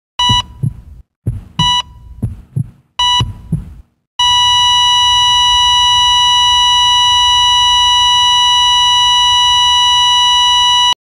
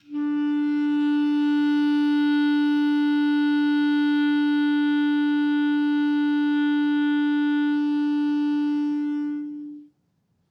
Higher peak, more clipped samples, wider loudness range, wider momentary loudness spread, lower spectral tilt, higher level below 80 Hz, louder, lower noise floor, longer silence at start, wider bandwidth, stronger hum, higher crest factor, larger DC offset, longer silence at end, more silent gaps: first, 0 dBFS vs -14 dBFS; neither; first, 9 LU vs 3 LU; first, 15 LU vs 4 LU; second, -0.5 dB/octave vs -5 dB/octave; first, -34 dBFS vs -84 dBFS; first, -8 LUFS vs -22 LUFS; second, -30 dBFS vs -69 dBFS; about the same, 0.2 s vs 0.1 s; first, 14.5 kHz vs 5.6 kHz; neither; about the same, 12 dB vs 8 dB; neither; second, 0.1 s vs 0.65 s; first, 1.16-1.22 s, 4.07-4.19 s vs none